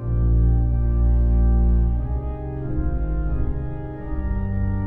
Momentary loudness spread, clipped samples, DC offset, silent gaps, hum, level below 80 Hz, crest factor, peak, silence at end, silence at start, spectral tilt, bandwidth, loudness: 10 LU; under 0.1%; under 0.1%; none; none; -20 dBFS; 10 dB; -10 dBFS; 0 s; 0 s; -13 dB/octave; 2.1 kHz; -23 LUFS